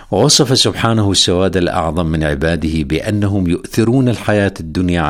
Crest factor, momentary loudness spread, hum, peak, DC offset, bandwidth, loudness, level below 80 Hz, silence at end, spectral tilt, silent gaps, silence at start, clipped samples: 14 dB; 7 LU; none; 0 dBFS; under 0.1%; 16.5 kHz; -14 LUFS; -34 dBFS; 0 s; -4.5 dB/octave; none; 0 s; under 0.1%